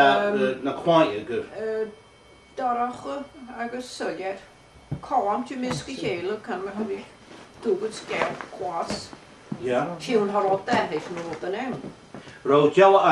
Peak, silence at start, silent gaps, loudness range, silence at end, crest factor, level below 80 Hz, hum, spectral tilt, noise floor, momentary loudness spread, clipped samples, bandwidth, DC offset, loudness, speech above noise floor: -4 dBFS; 0 s; none; 6 LU; 0 s; 20 dB; -60 dBFS; none; -5.5 dB/octave; -52 dBFS; 17 LU; under 0.1%; 11.5 kHz; under 0.1%; -25 LUFS; 28 dB